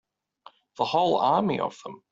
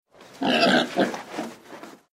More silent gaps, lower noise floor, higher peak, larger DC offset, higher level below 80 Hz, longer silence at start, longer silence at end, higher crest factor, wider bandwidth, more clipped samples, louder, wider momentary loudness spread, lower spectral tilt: neither; first, -55 dBFS vs -44 dBFS; about the same, -10 dBFS vs -8 dBFS; neither; about the same, -68 dBFS vs -68 dBFS; first, 0.8 s vs 0.2 s; about the same, 0.15 s vs 0.15 s; about the same, 18 dB vs 18 dB; second, 7.8 kHz vs 16 kHz; neither; second, -25 LUFS vs -22 LUFS; second, 10 LU vs 24 LU; first, -6 dB/octave vs -4 dB/octave